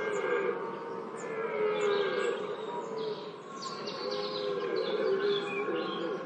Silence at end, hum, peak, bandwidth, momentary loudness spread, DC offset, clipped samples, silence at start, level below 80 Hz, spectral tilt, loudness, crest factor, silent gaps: 0 s; none; -18 dBFS; 9.2 kHz; 10 LU; under 0.1%; under 0.1%; 0 s; under -90 dBFS; -4.5 dB/octave; -33 LUFS; 14 dB; none